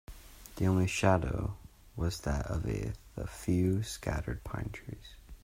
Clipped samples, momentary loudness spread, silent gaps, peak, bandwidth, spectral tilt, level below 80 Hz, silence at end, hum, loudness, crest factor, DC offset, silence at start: under 0.1%; 21 LU; none; -12 dBFS; 16 kHz; -6 dB/octave; -44 dBFS; 0.1 s; none; -33 LUFS; 22 dB; under 0.1%; 0.1 s